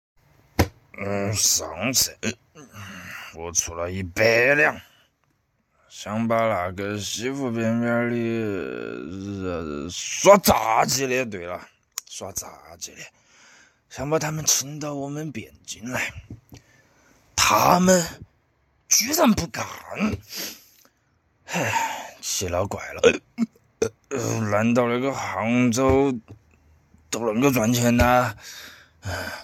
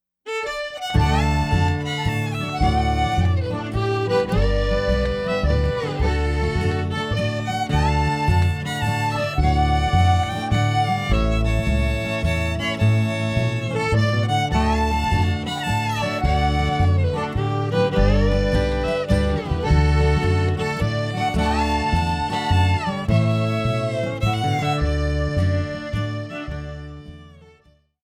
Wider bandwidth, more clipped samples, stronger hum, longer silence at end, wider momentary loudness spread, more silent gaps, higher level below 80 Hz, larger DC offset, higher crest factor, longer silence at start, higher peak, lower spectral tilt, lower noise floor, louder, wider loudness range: first, 17 kHz vs 13.5 kHz; neither; neither; second, 0 s vs 0.75 s; first, 19 LU vs 5 LU; neither; second, -48 dBFS vs -26 dBFS; neither; first, 24 dB vs 16 dB; first, 0.6 s vs 0.25 s; first, 0 dBFS vs -6 dBFS; second, -3.5 dB/octave vs -6.5 dB/octave; first, -69 dBFS vs -57 dBFS; about the same, -22 LUFS vs -21 LUFS; first, 6 LU vs 2 LU